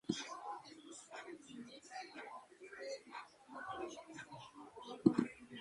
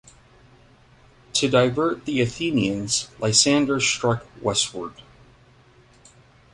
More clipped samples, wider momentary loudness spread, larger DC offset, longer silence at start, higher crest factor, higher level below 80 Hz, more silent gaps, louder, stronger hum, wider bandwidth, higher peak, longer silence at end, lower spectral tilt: neither; first, 19 LU vs 9 LU; neither; second, 0.05 s vs 1.35 s; first, 30 dB vs 22 dB; second, -78 dBFS vs -54 dBFS; neither; second, -44 LUFS vs -21 LUFS; neither; about the same, 11.5 kHz vs 11.5 kHz; second, -14 dBFS vs -2 dBFS; second, 0 s vs 1.55 s; first, -5 dB/octave vs -3.5 dB/octave